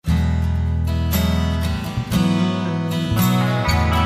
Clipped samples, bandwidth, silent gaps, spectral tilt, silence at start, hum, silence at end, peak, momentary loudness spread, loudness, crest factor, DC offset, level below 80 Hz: under 0.1%; 15.5 kHz; none; -6 dB/octave; 0.05 s; none; 0 s; -4 dBFS; 4 LU; -20 LUFS; 14 dB; under 0.1%; -26 dBFS